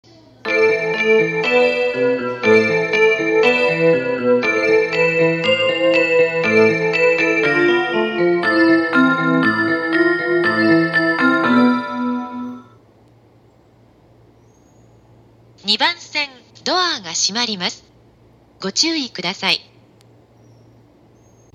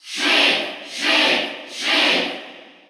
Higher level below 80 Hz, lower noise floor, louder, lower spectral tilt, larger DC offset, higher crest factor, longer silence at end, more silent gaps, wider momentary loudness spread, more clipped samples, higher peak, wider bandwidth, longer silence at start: first, -60 dBFS vs -86 dBFS; first, -51 dBFS vs -40 dBFS; about the same, -16 LUFS vs -17 LUFS; first, -4 dB/octave vs -1 dB/octave; neither; about the same, 16 dB vs 16 dB; first, 1.95 s vs 0.25 s; neither; second, 8 LU vs 12 LU; neither; first, 0 dBFS vs -4 dBFS; second, 9.4 kHz vs over 20 kHz; first, 0.45 s vs 0.05 s